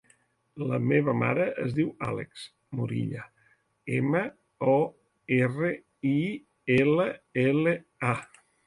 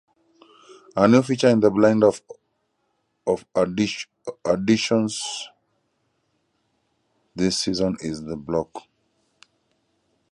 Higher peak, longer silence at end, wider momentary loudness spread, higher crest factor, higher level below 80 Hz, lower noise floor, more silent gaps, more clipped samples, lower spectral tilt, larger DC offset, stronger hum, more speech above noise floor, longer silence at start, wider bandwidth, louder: second, -10 dBFS vs -2 dBFS; second, 0.4 s vs 1.55 s; second, 12 LU vs 16 LU; about the same, 18 dB vs 22 dB; second, -64 dBFS vs -56 dBFS; second, -66 dBFS vs -72 dBFS; neither; neither; first, -8 dB/octave vs -5 dB/octave; neither; neither; second, 40 dB vs 51 dB; second, 0.55 s vs 0.95 s; about the same, 11.5 kHz vs 11.5 kHz; second, -28 LUFS vs -22 LUFS